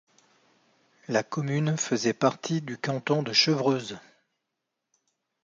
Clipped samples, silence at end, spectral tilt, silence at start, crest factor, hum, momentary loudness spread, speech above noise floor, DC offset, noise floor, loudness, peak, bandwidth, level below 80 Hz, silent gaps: under 0.1%; 1.45 s; -4.5 dB/octave; 1.1 s; 22 dB; none; 9 LU; 57 dB; under 0.1%; -83 dBFS; -26 LUFS; -8 dBFS; 7.6 kHz; -74 dBFS; none